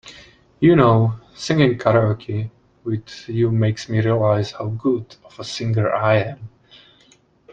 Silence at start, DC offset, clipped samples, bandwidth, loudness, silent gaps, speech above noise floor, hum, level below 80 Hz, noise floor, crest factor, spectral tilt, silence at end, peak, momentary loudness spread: 0.05 s; under 0.1%; under 0.1%; 8 kHz; -19 LUFS; none; 37 dB; none; -52 dBFS; -55 dBFS; 18 dB; -7.5 dB/octave; 1.05 s; 0 dBFS; 14 LU